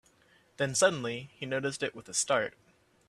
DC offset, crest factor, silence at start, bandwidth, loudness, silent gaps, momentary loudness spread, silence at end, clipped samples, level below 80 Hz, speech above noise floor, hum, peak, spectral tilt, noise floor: under 0.1%; 22 dB; 0.6 s; 13 kHz; -31 LUFS; none; 11 LU; 0.6 s; under 0.1%; -70 dBFS; 34 dB; none; -10 dBFS; -2.5 dB/octave; -65 dBFS